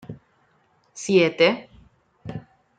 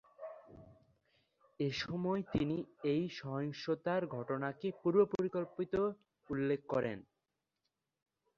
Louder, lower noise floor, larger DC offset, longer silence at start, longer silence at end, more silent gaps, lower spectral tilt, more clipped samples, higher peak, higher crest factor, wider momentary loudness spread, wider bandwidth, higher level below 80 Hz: first, -20 LUFS vs -37 LUFS; second, -63 dBFS vs -88 dBFS; neither; about the same, 0.1 s vs 0.2 s; second, 0.4 s vs 1.35 s; neither; second, -4.5 dB/octave vs -6 dB/octave; neither; first, -4 dBFS vs -18 dBFS; about the same, 20 dB vs 20 dB; first, 24 LU vs 10 LU; first, 9.4 kHz vs 7.2 kHz; about the same, -62 dBFS vs -66 dBFS